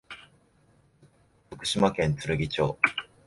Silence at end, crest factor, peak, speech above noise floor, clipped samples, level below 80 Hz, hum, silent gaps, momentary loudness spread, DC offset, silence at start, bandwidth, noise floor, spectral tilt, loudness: 0.2 s; 26 dB; -4 dBFS; 37 dB; under 0.1%; -52 dBFS; none; none; 21 LU; under 0.1%; 0.1 s; 11.5 kHz; -63 dBFS; -5 dB/octave; -26 LUFS